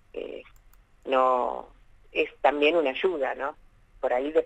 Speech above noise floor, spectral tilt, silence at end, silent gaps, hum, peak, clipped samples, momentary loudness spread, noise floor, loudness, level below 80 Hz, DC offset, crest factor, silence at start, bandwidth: 31 dB; -5 dB/octave; 0 s; none; none; -8 dBFS; under 0.1%; 16 LU; -56 dBFS; -26 LUFS; -58 dBFS; under 0.1%; 20 dB; 0.15 s; 8.8 kHz